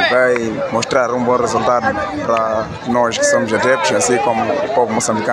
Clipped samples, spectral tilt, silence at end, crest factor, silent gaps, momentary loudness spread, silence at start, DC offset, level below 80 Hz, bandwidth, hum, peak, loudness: under 0.1%; -3.5 dB/octave; 0 s; 14 dB; none; 5 LU; 0 s; under 0.1%; -48 dBFS; 14 kHz; none; -2 dBFS; -15 LUFS